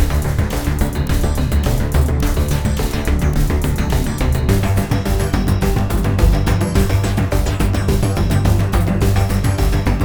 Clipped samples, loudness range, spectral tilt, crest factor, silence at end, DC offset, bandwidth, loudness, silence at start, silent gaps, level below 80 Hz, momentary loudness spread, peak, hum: under 0.1%; 1 LU; -6 dB/octave; 14 dB; 0 s; 0.9%; over 20 kHz; -17 LUFS; 0 s; none; -20 dBFS; 3 LU; 0 dBFS; none